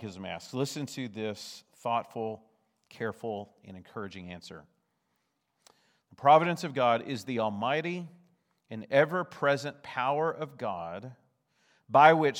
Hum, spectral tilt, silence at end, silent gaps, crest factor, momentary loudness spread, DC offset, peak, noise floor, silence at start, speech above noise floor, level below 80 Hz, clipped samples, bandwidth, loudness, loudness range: none; -5.5 dB/octave; 0 s; none; 26 dB; 22 LU; under 0.1%; -4 dBFS; -78 dBFS; 0 s; 49 dB; -80 dBFS; under 0.1%; 16.5 kHz; -29 LUFS; 14 LU